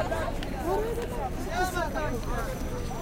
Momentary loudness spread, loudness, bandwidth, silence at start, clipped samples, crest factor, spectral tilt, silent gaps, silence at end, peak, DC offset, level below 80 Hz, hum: 5 LU; -31 LUFS; 16.5 kHz; 0 s; under 0.1%; 14 dB; -5.5 dB/octave; none; 0 s; -16 dBFS; under 0.1%; -36 dBFS; none